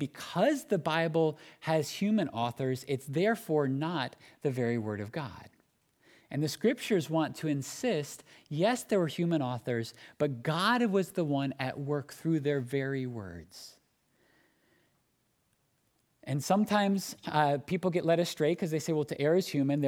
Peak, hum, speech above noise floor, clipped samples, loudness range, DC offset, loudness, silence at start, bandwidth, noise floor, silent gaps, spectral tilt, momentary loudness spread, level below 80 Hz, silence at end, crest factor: -12 dBFS; none; 44 dB; under 0.1%; 6 LU; under 0.1%; -31 LUFS; 0 s; 18 kHz; -75 dBFS; none; -6 dB/octave; 11 LU; -72 dBFS; 0 s; 20 dB